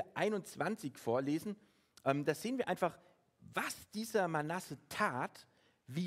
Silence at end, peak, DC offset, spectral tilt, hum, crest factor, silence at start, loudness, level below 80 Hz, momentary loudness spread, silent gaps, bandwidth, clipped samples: 0 s; -18 dBFS; under 0.1%; -5 dB/octave; none; 22 dB; 0 s; -38 LUFS; -78 dBFS; 8 LU; none; 16 kHz; under 0.1%